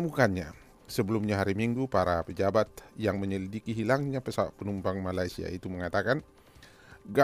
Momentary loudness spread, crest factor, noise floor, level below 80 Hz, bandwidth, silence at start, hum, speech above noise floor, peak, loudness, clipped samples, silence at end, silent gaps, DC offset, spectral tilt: 8 LU; 20 dB; -55 dBFS; -56 dBFS; 15.5 kHz; 0 s; none; 25 dB; -10 dBFS; -31 LUFS; under 0.1%; 0 s; none; under 0.1%; -6.5 dB/octave